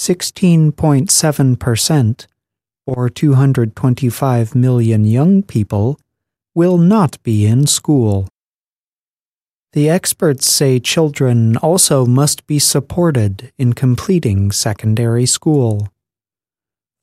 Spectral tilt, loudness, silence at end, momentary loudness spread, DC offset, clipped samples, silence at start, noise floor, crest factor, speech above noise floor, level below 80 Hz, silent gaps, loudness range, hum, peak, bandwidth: -5 dB/octave; -13 LUFS; 1.15 s; 8 LU; under 0.1%; under 0.1%; 0 s; under -90 dBFS; 14 dB; over 77 dB; -46 dBFS; 8.32-8.36 s, 8.49-9.33 s, 9.53-9.66 s; 3 LU; none; 0 dBFS; 15.5 kHz